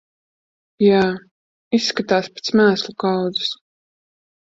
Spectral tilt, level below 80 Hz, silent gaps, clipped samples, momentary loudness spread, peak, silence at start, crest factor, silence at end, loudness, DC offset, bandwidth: -5 dB/octave; -60 dBFS; 1.31-1.71 s; under 0.1%; 8 LU; -2 dBFS; 0.8 s; 18 dB; 0.9 s; -19 LUFS; under 0.1%; 7.8 kHz